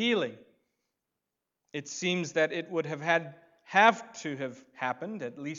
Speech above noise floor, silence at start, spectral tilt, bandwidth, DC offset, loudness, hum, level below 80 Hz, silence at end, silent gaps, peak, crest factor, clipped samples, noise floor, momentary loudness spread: 56 dB; 0 s; -4 dB/octave; 7.8 kHz; under 0.1%; -30 LUFS; none; -84 dBFS; 0 s; none; -6 dBFS; 26 dB; under 0.1%; -86 dBFS; 16 LU